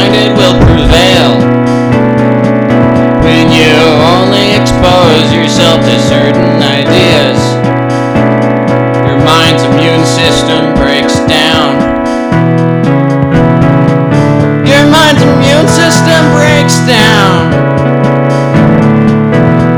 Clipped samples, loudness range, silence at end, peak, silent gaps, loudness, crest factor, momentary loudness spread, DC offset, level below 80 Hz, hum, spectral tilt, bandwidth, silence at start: 8%; 2 LU; 0 s; 0 dBFS; none; -6 LUFS; 6 dB; 4 LU; under 0.1%; -24 dBFS; none; -5.5 dB/octave; 19 kHz; 0 s